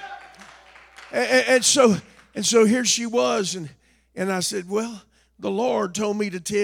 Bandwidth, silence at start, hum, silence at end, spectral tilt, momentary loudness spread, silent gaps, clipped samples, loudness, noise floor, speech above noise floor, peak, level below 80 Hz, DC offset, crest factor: 18 kHz; 0 s; none; 0 s; -3 dB/octave; 17 LU; none; under 0.1%; -21 LUFS; -48 dBFS; 27 dB; -4 dBFS; -64 dBFS; under 0.1%; 20 dB